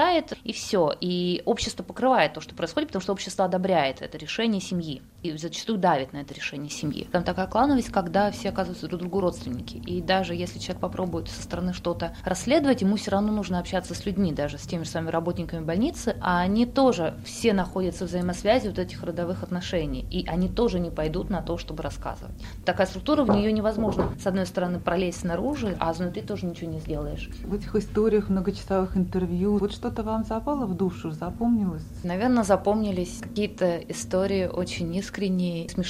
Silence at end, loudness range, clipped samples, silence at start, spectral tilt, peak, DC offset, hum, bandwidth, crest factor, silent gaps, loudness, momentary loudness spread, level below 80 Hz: 0 s; 3 LU; under 0.1%; 0 s; -6 dB/octave; -6 dBFS; under 0.1%; none; 15.5 kHz; 20 dB; none; -27 LUFS; 10 LU; -42 dBFS